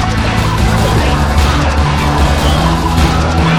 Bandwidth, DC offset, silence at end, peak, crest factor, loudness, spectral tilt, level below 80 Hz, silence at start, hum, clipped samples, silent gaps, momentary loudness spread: 15.5 kHz; 2%; 0 s; 0 dBFS; 10 dB; -12 LUFS; -5.5 dB/octave; -16 dBFS; 0 s; none; under 0.1%; none; 1 LU